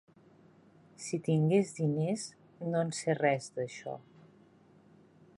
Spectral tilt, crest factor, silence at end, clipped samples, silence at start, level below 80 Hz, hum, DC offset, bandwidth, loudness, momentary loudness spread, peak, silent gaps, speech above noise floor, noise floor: -6 dB/octave; 18 dB; 1.4 s; under 0.1%; 1 s; -78 dBFS; none; under 0.1%; 11.5 kHz; -32 LUFS; 16 LU; -16 dBFS; none; 30 dB; -61 dBFS